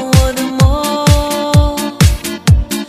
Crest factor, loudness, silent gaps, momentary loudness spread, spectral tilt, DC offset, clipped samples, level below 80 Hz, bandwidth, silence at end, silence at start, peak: 12 dB; -12 LUFS; none; 3 LU; -5.5 dB/octave; under 0.1%; 0.2%; -18 dBFS; 16 kHz; 0 s; 0 s; 0 dBFS